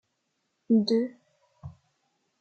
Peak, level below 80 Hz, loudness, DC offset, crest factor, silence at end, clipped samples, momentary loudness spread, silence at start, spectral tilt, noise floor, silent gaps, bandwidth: -14 dBFS; -68 dBFS; -26 LUFS; under 0.1%; 18 dB; 0.7 s; under 0.1%; 25 LU; 0.7 s; -7 dB/octave; -78 dBFS; none; 7.8 kHz